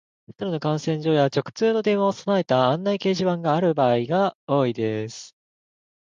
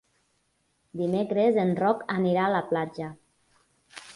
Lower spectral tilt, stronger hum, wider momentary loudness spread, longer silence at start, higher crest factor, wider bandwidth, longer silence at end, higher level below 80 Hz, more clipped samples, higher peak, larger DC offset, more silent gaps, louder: about the same, -6.5 dB/octave vs -7.5 dB/octave; neither; second, 7 LU vs 17 LU; second, 0.3 s vs 0.95 s; about the same, 16 dB vs 18 dB; second, 9.2 kHz vs 11.5 kHz; first, 0.75 s vs 0.05 s; about the same, -66 dBFS vs -68 dBFS; neither; first, -6 dBFS vs -10 dBFS; neither; first, 4.35-4.47 s vs none; first, -22 LUFS vs -26 LUFS